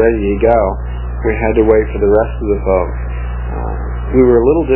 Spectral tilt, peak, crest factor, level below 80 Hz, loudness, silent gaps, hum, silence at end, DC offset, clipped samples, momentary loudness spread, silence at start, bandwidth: -12.5 dB/octave; 0 dBFS; 12 dB; -20 dBFS; -14 LUFS; none; 60 Hz at -20 dBFS; 0 s; under 0.1%; under 0.1%; 12 LU; 0 s; 3.2 kHz